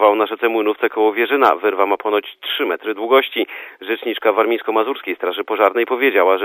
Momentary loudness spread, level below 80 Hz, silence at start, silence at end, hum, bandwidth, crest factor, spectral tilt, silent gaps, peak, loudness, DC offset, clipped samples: 8 LU; -76 dBFS; 0 s; 0 s; none; 15.5 kHz; 18 dB; -5 dB/octave; none; 0 dBFS; -17 LUFS; under 0.1%; under 0.1%